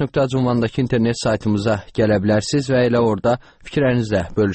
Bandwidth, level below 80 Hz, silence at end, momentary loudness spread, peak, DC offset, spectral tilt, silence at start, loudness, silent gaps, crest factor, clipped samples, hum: 8.8 kHz; -44 dBFS; 0 s; 4 LU; -6 dBFS; 0.1%; -6.5 dB/octave; 0 s; -19 LUFS; none; 12 dB; under 0.1%; none